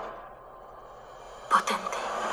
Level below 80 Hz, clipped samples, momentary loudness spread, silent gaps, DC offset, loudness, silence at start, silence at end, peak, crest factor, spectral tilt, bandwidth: -60 dBFS; under 0.1%; 22 LU; none; under 0.1%; -28 LUFS; 0 s; 0 s; -8 dBFS; 24 dB; -2 dB/octave; over 20 kHz